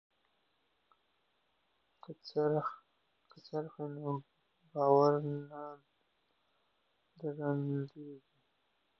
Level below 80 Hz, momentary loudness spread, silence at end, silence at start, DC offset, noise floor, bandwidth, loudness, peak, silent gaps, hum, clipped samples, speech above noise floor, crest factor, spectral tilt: -84 dBFS; 22 LU; 0.8 s; 2.1 s; under 0.1%; -79 dBFS; 6.2 kHz; -35 LUFS; -16 dBFS; none; none; under 0.1%; 44 dB; 24 dB; -7.5 dB/octave